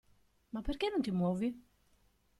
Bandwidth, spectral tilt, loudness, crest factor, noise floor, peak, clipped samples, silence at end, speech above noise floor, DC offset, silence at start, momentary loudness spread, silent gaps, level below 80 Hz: 12 kHz; -7.5 dB/octave; -36 LUFS; 16 dB; -71 dBFS; -22 dBFS; under 0.1%; 0.8 s; 36 dB; under 0.1%; 0.55 s; 12 LU; none; -52 dBFS